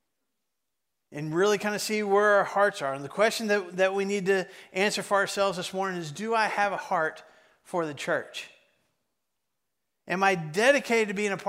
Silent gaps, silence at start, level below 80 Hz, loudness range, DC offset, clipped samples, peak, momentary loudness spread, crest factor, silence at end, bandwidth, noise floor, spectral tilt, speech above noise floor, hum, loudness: none; 1.1 s; -76 dBFS; 7 LU; under 0.1%; under 0.1%; -8 dBFS; 10 LU; 20 dB; 0 s; 16 kHz; -84 dBFS; -4 dB/octave; 58 dB; none; -26 LUFS